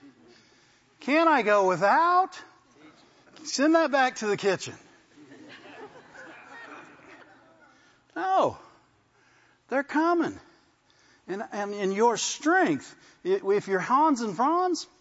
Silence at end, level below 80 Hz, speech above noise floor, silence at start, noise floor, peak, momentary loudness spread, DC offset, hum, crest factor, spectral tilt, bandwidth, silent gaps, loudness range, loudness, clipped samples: 0.15 s; -76 dBFS; 39 dB; 1 s; -64 dBFS; -8 dBFS; 24 LU; under 0.1%; none; 18 dB; -4 dB/octave; 8 kHz; none; 10 LU; -25 LUFS; under 0.1%